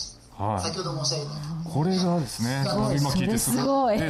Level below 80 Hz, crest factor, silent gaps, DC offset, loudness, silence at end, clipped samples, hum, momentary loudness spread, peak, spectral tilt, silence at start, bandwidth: -48 dBFS; 12 dB; none; under 0.1%; -26 LUFS; 0 s; under 0.1%; none; 9 LU; -14 dBFS; -5 dB/octave; 0 s; 15.5 kHz